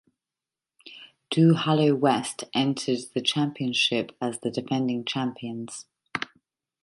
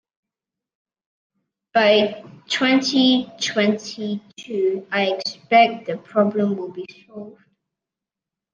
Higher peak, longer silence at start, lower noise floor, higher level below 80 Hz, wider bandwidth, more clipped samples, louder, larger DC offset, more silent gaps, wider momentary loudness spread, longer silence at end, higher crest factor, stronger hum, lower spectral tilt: second, -8 dBFS vs -2 dBFS; second, 0.85 s vs 1.75 s; about the same, under -90 dBFS vs -87 dBFS; about the same, -72 dBFS vs -74 dBFS; first, 11.5 kHz vs 9.4 kHz; neither; second, -25 LUFS vs -20 LUFS; neither; neither; about the same, 16 LU vs 18 LU; second, 0.6 s vs 1.2 s; about the same, 20 dB vs 20 dB; neither; about the same, -5 dB/octave vs -4.5 dB/octave